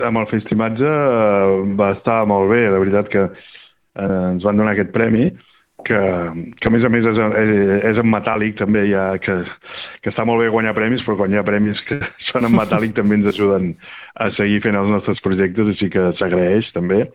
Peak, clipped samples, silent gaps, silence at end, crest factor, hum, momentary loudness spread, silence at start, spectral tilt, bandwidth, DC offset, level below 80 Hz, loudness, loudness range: 0 dBFS; under 0.1%; none; 0.05 s; 16 dB; none; 8 LU; 0 s; -9 dB/octave; 4.9 kHz; under 0.1%; -50 dBFS; -17 LUFS; 3 LU